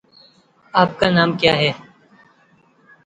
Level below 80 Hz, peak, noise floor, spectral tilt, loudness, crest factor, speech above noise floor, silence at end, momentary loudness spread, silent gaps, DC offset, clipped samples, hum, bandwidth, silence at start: -54 dBFS; 0 dBFS; -56 dBFS; -6 dB/octave; -17 LUFS; 20 dB; 39 dB; 1.3 s; 6 LU; none; under 0.1%; under 0.1%; none; 9 kHz; 0.75 s